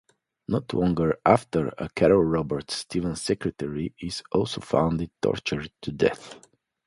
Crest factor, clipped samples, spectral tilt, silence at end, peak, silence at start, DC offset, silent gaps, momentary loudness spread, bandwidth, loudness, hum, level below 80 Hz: 22 dB; under 0.1%; -6 dB/octave; 0.5 s; -4 dBFS; 0.5 s; under 0.1%; none; 11 LU; 11.5 kHz; -26 LUFS; none; -48 dBFS